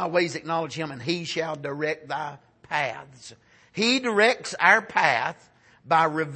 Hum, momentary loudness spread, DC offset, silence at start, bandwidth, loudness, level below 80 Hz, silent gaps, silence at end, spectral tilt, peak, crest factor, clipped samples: none; 13 LU; under 0.1%; 0 s; 8.8 kHz; -24 LUFS; -70 dBFS; none; 0 s; -4 dB/octave; -2 dBFS; 22 dB; under 0.1%